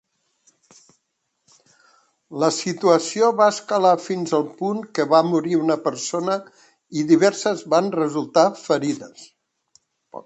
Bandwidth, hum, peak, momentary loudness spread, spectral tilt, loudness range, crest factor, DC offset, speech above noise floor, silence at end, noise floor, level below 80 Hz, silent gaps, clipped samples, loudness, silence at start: 8.8 kHz; none; -2 dBFS; 10 LU; -5 dB/octave; 3 LU; 20 dB; under 0.1%; 47 dB; 0.05 s; -66 dBFS; -72 dBFS; none; under 0.1%; -20 LUFS; 2.3 s